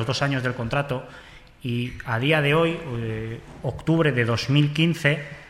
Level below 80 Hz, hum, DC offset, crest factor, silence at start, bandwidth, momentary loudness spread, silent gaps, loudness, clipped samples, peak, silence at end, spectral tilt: -48 dBFS; none; under 0.1%; 18 dB; 0 s; 13.5 kHz; 12 LU; none; -23 LUFS; under 0.1%; -6 dBFS; 0 s; -6 dB/octave